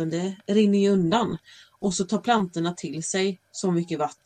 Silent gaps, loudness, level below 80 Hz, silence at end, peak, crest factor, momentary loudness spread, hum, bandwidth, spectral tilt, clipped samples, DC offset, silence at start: none; -25 LUFS; -60 dBFS; 0.1 s; -10 dBFS; 14 dB; 9 LU; none; 10 kHz; -5.5 dB/octave; under 0.1%; under 0.1%; 0 s